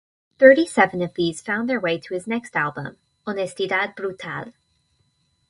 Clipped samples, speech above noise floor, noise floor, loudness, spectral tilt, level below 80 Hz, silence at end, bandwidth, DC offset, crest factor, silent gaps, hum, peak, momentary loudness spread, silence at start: under 0.1%; 46 dB; -67 dBFS; -21 LUFS; -5 dB/octave; -62 dBFS; 1 s; 11.5 kHz; under 0.1%; 22 dB; none; none; 0 dBFS; 19 LU; 0.4 s